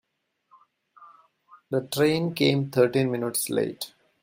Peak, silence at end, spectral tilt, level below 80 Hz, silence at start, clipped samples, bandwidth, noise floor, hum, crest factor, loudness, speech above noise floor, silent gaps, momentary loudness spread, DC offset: -8 dBFS; 0.35 s; -5 dB/octave; -68 dBFS; 1 s; under 0.1%; 16 kHz; -73 dBFS; none; 20 dB; -25 LUFS; 49 dB; none; 8 LU; under 0.1%